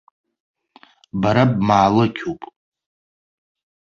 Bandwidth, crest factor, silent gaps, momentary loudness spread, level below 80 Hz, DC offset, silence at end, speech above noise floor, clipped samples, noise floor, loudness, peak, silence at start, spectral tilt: 7.4 kHz; 20 dB; none; 15 LU; -50 dBFS; under 0.1%; 1.5 s; 35 dB; under 0.1%; -52 dBFS; -17 LUFS; -2 dBFS; 1.15 s; -7.5 dB/octave